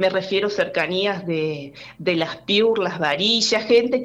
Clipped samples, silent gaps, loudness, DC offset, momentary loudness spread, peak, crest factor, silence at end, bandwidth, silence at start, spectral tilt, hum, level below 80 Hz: under 0.1%; none; -20 LUFS; under 0.1%; 9 LU; -6 dBFS; 14 dB; 0 s; 9 kHz; 0 s; -4 dB/octave; none; -60 dBFS